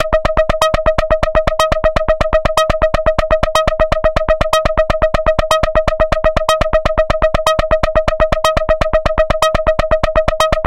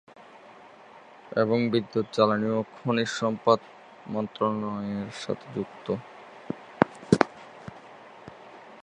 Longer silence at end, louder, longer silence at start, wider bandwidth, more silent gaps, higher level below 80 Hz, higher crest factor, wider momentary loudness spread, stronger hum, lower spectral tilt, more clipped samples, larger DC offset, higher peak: about the same, 0 s vs 0.05 s; first, -14 LUFS vs -27 LUFS; second, 0 s vs 0.2 s; first, 16 kHz vs 11 kHz; neither; first, -22 dBFS vs -62 dBFS; second, 14 dB vs 28 dB; second, 2 LU vs 23 LU; neither; second, -4.5 dB/octave vs -6 dB/octave; neither; first, 0.9% vs under 0.1%; about the same, 0 dBFS vs 0 dBFS